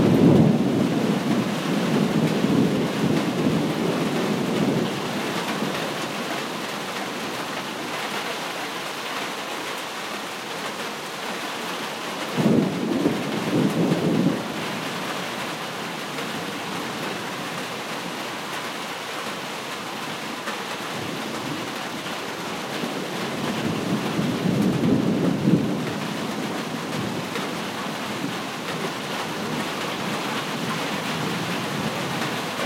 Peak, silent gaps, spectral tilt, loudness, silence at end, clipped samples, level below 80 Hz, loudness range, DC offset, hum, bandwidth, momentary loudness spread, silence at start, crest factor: -4 dBFS; none; -5 dB/octave; -25 LUFS; 0 s; under 0.1%; -58 dBFS; 7 LU; under 0.1%; none; 16 kHz; 8 LU; 0 s; 20 dB